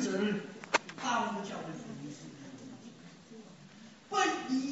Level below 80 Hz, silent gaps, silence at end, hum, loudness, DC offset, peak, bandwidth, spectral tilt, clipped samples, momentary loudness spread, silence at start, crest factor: -76 dBFS; none; 0 s; none; -35 LUFS; under 0.1%; -12 dBFS; 8 kHz; -3 dB/octave; under 0.1%; 22 LU; 0 s; 24 dB